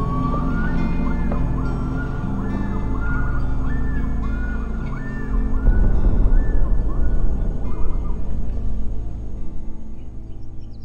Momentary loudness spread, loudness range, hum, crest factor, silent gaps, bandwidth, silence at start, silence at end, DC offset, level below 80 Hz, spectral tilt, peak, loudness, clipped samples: 14 LU; 5 LU; none; 14 dB; none; 3.7 kHz; 0 s; 0 s; under 0.1%; -20 dBFS; -9 dB/octave; -4 dBFS; -25 LUFS; under 0.1%